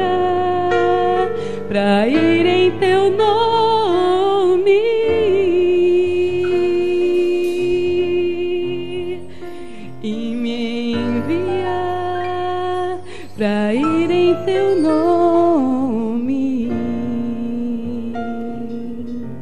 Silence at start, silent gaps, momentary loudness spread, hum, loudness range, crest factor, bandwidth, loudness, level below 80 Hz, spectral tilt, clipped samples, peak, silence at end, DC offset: 0 s; none; 12 LU; none; 7 LU; 14 dB; 10 kHz; -17 LUFS; -48 dBFS; -6.5 dB/octave; under 0.1%; -4 dBFS; 0 s; 3%